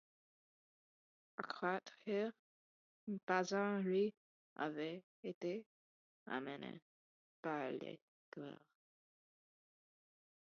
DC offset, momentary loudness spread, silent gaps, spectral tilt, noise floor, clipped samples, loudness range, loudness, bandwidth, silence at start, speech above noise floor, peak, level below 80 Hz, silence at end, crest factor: under 0.1%; 17 LU; 2.39-3.07 s, 3.23-3.27 s, 4.17-4.56 s, 5.03-5.23 s, 5.34-5.41 s, 5.66-6.26 s, 6.82-7.43 s, 8.02-8.32 s; -4.5 dB/octave; under -90 dBFS; under 0.1%; 9 LU; -44 LUFS; 6.8 kHz; 1.4 s; over 47 dB; -22 dBFS; under -90 dBFS; 1.9 s; 24 dB